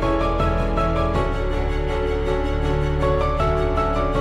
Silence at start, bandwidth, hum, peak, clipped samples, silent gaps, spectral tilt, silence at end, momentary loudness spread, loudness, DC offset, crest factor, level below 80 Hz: 0 s; 10 kHz; none; -8 dBFS; under 0.1%; none; -7.5 dB/octave; 0 s; 3 LU; -22 LUFS; under 0.1%; 12 dB; -24 dBFS